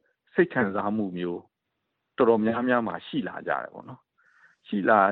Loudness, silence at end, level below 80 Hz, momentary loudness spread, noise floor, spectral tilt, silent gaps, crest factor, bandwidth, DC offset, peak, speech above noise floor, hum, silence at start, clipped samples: -26 LUFS; 0 s; -70 dBFS; 13 LU; -80 dBFS; -9.5 dB/octave; none; 22 dB; 4.4 kHz; under 0.1%; -6 dBFS; 56 dB; none; 0.35 s; under 0.1%